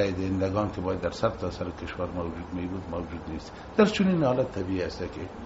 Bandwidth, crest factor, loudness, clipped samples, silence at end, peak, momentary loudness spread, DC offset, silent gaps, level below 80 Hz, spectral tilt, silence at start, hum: 8 kHz; 22 dB; -29 LUFS; under 0.1%; 0 s; -8 dBFS; 12 LU; under 0.1%; none; -48 dBFS; -6 dB/octave; 0 s; none